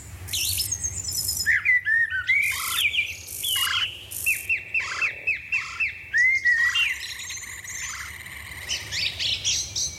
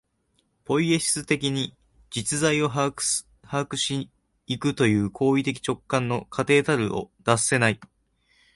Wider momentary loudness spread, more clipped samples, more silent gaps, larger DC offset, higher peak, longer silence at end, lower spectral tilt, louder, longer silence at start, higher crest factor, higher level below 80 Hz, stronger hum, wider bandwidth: first, 13 LU vs 9 LU; neither; neither; neither; second, -10 dBFS vs -4 dBFS; second, 0 s vs 0.7 s; second, 1 dB/octave vs -4 dB/octave; about the same, -23 LUFS vs -24 LUFS; second, 0 s vs 0.7 s; about the same, 16 dB vs 20 dB; first, -50 dBFS vs -56 dBFS; neither; first, 17 kHz vs 12 kHz